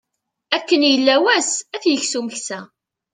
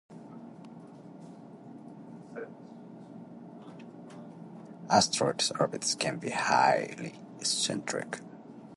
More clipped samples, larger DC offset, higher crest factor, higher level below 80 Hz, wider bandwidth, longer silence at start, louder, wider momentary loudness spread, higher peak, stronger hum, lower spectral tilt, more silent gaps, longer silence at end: neither; neither; second, 18 dB vs 26 dB; about the same, -70 dBFS vs -74 dBFS; second, 9.8 kHz vs 11.5 kHz; first, 0.5 s vs 0.1 s; first, -17 LUFS vs -29 LUFS; second, 13 LU vs 24 LU; first, -2 dBFS vs -8 dBFS; neither; second, -1 dB/octave vs -2.5 dB/octave; neither; first, 0.5 s vs 0 s